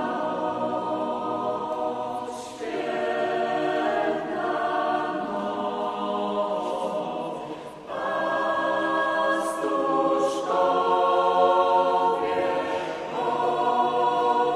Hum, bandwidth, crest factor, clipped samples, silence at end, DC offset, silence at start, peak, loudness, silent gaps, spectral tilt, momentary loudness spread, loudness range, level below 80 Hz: none; 12.5 kHz; 16 dB; under 0.1%; 0 s; under 0.1%; 0 s; -8 dBFS; -25 LUFS; none; -4.5 dB/octave; 9 LU; 6 LU; -66 dBFS